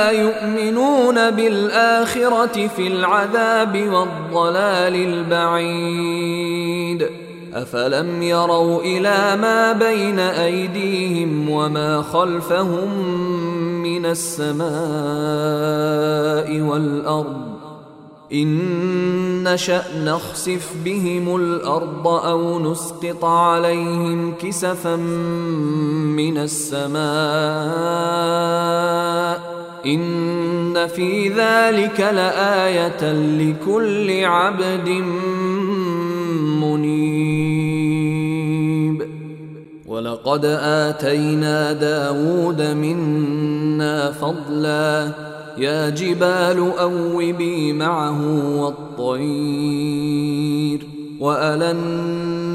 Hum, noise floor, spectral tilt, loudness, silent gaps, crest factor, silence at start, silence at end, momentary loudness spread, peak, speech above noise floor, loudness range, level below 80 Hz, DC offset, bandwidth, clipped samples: none; -42 dBFS; -5.5 dB/octave; -19 LUFS; none; 16 dB; 0 s; 0 s; 6 LU; -2 dBFS; 23 dB; 4 LU; -60 dBFS; under 0.1%; 16 kHz; under 0.1%